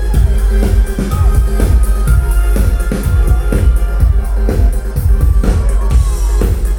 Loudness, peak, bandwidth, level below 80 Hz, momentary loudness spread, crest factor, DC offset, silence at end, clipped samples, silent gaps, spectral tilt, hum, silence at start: -14 LUFS; 0 dBFS; 16.5 kHz; -10 dBFS; 2 LU; 10 dB; under 0.1%; 0 s; under 0.1%; none; -7 dB/octave; none; 0 s